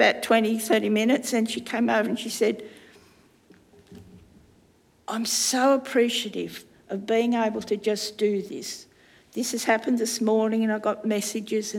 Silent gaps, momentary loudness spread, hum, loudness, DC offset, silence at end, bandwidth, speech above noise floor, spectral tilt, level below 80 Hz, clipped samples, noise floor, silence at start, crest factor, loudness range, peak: none; 13 LU; none; -24 LUFS; under 0.1%; 0 s; 17 kHz; 36 dB; -3 dB/octave; -70 dBFS; under 0.1%; -60 dBFS; 0 s; 20 dB; 5 LU; -6 dBFS